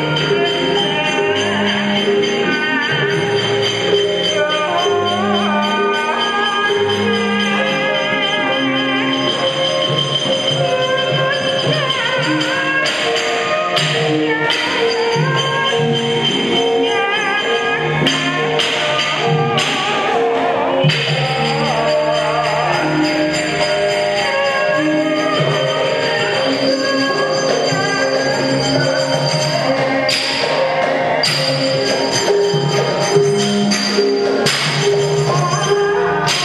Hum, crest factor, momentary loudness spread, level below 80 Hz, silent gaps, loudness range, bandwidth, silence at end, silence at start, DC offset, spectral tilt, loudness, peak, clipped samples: none; 16 dB; 1 LU; -52 dBFS; none; 1 LU; 13 kHz; 0 s; 0 s; under 0.1%; -4 dB/octave; -15 LUFS; 0 dBFS; under 0.1%